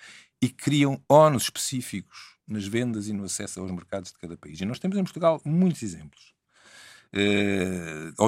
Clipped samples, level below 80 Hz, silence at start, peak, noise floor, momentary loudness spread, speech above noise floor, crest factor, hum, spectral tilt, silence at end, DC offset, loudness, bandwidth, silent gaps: under 0.1%; -62 dBFS; 0 s; -4 dBFS; -54 dBFS; 17 LU; 28 dB; 22 dB; none; -5 dB/octave; 0 s; under 0.1%; -25 LUFS; 16 kHz; none